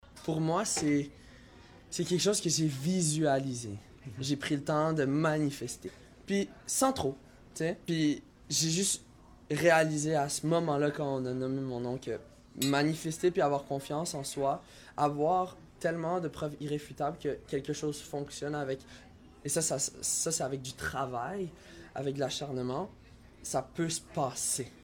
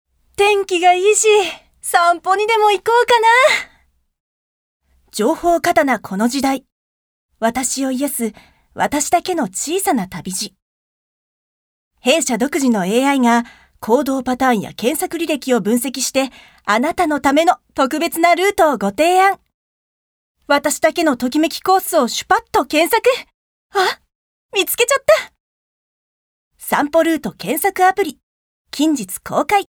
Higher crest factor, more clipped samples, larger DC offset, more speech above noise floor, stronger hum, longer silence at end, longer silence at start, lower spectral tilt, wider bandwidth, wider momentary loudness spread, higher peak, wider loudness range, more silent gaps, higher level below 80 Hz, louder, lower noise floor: about the same, 20 dB vs 18 dB; neither; neither; second, 23 dB vs over 74 dB; neither; about the same, 0 s vs 0.05 s; second, 0.1 s vs 0.4 s; about the same, -4 dB/octave vs -3 dB/octave; second, 18 kHz vs over 20 kHz; about the same, 11 LU vs 10 LU; second, -12 dBFS vs 0 dBFS; about the same, 6 LU vs 5 LU; second, none vs 4.20-4.80 s, 6.72-7.29 s, 10.62-11.91 s, 19.54-20.35 s, 23.34-23.70 s, 24.15-24.49 s, 25.40-26.51 s, 28.23-28.65 s; second, -60 dBFS vs -52 dBFS; second, -32 LUFS vs -16 LUFS; second, -55 dBFS vs under -90 dBFS